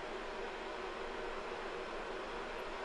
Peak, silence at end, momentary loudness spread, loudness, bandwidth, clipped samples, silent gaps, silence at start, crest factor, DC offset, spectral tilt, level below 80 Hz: -30 dBFS; 0 s; 1 LU; -43 LUFS; 12 kHz; under 0.1%; none; 0 s; 12 dB; under 0.1%; -3.5 dB/octave; -56 dBFS